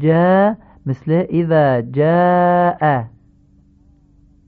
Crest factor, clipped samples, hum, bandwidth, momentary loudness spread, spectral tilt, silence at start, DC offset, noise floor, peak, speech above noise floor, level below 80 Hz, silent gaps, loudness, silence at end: 14 dB; under 0.1%; none; 4.6 kHz; 12 LU; -11 dB/octave; 0 s; under 0.1%; -51 dBFS; -2 dBFS; 37 dB; -50 dBFS; none; -15 LUFS; 1.4 s